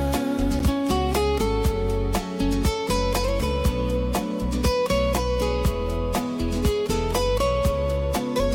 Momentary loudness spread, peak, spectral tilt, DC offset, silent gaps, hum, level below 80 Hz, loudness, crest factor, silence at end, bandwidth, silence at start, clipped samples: 4 LU; -12 dBFS; -5.5 dB/octave; under 0.1%; none; none; -28 dBFS; -24 LUFS; 12 dB; 0 s; 17 kHz; 0 s; under 0.1%